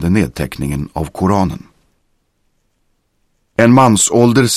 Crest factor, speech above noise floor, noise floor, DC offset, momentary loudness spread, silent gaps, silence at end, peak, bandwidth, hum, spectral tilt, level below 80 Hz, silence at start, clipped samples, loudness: 14 dB; 50 dB; -63 dBFS; under 0.1%; 13 LU; none; 0 s; 0 dBFS; 15.5 kHz; none; -5 dB/octave; -36 dBFS; 0 s; under 0.1%; -13 LUFS